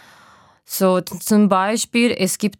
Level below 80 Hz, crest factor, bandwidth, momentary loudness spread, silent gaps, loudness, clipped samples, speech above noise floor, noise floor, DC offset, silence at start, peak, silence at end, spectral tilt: -64 dBFS; 16 dB; 17.5 kHz; 5 LU; none; -18 LUFS; under 0.1%; 33 dB; -50 dBFS; under 0.1%; 0.7 s; -2 dBFS; 0.1 s; -4.5 dB/octave